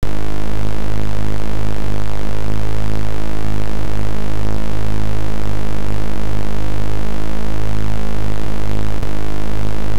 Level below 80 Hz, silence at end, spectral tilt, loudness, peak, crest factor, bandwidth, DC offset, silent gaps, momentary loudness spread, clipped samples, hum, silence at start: -26 dBFS; 0 s; -6.5 dB/octave; -24 LUFS; -6 dBFS; 14 dB; 17 kHz; 40%; none; 2 LU; under 0.1%; none; 0 s